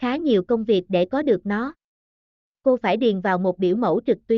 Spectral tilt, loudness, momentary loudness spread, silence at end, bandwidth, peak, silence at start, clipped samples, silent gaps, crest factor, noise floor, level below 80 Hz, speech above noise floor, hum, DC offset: -5 dB/octave; -21 LUFS; 4 LU; 0 s; 6.4 kHz; -8 dBFS; 0 s; under 0.1%; 1.84-2.55 s; 14 dB; under -90 dBFS; -60 dBFS; over 69 dB; none; under 0.1%